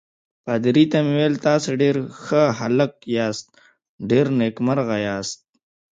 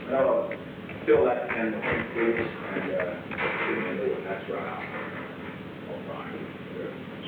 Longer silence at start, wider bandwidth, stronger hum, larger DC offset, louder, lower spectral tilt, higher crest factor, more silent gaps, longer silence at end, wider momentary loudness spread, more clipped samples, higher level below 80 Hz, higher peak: first, 0.45 s vs 0 s; first, 9.2 kHz vs 4.7 kHz; neither; neither; first, -20 LUFS vs -29 LUFS; second, -6 dB/octave vs -8 dB/octave; about the same, 18 dB vs 18 dB; first, 3.89-3.99 s vs none; first, 0.6 s vs 0 s; about the same, 11 LU vs 13 LU; neither; about the same, -62 dBFS vs -60 dBFS; first, -4 dBFS vs -10 dBFS